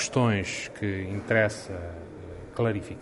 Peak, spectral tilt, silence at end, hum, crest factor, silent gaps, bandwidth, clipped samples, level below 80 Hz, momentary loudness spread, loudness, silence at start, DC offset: -8 dBFS; -5 dB/octave; 0 s; none; 20 dB; none; 11.5 kHz; under 0.1%; -52 dBFS; 16 LU; -28 LUFS; 0 s; under 0.1%